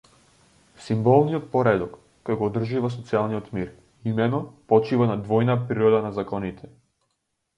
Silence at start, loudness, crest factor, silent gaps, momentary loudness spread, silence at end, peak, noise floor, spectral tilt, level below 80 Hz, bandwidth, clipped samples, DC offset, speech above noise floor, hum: 0.8 s; -23 LUFS; 20 dB; none; 13 LU; 0.9 s; -4 dBFS; -76 dBFS; -8.5 dB/octave; -56 dBFS; 9.8 kHz; under 0.1%; under 0.1%; 54 dB; none